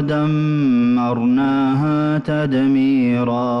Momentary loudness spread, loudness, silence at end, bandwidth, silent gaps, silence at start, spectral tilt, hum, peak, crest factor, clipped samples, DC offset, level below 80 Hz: 3 LU; -17 LUFS; 0 s; 6 kHz; none; 0 s; -9 dB/octave; none; -10 dBFS; 6 dB; under 0.1%; under 0.1%; -52 dBFS